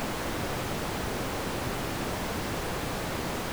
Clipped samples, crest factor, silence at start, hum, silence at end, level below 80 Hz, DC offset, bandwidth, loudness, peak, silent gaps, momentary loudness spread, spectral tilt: under 0.1%; 12 dB; 0 s; none; 0 s; -42 dBFS; under 0.1%; over 20 kHz; -32 LUFS; -20 dBFS; none; 0 LU; -4.5 dB/octave